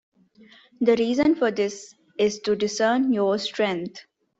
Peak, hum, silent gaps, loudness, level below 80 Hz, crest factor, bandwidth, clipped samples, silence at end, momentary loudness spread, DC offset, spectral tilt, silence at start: -6 dBFS; none; none; -23 LUFS; -62 dBFS; 18 dB; 8 kHz; under 0.1%; 0.4 s; 10 LU; under 0.1%; -4.5 dB/octave; 0.8 s